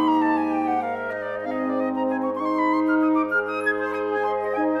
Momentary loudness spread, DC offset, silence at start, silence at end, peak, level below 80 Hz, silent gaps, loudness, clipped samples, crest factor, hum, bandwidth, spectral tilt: 7 LU; under 0.1%; 0 s; 0 s; -10 dBFS; -68 dBFS; none; -23 LUFS; under 0.1%; 12 dB; none; 11.5 kHz; -6.5 dB/octave